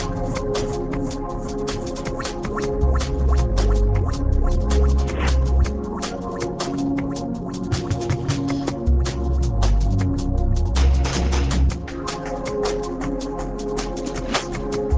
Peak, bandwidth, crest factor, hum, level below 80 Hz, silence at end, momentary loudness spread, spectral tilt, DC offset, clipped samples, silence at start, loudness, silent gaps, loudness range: -6 dBFS; 8 kHz; 14 dB; none; -22 dBFS; 0 s; 7 LU; -6 dB/octave; under 0.1%; under 0.1%; 0 s; -23 LUFS; none; 4 LU